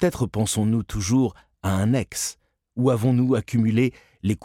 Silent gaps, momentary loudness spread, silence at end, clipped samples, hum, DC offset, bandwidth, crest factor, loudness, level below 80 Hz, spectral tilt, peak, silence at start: none; 8 LU; 0 s; under 0.1%; none; under 0.1%; 16 kHz; 14 dB; -23 LUFS; -46 dBFS; -6 dB/octave; -8 dBFS; 0 s